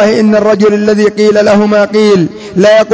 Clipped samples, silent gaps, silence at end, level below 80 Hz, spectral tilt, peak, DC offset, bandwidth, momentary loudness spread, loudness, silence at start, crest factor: 0.2%; none; 0 s; -46 dBFS; -6 dB/octave; 0 dBFS; under 0.1%; 8 kHz; 3 LU; -8 LUFS; 0 s; 6 dB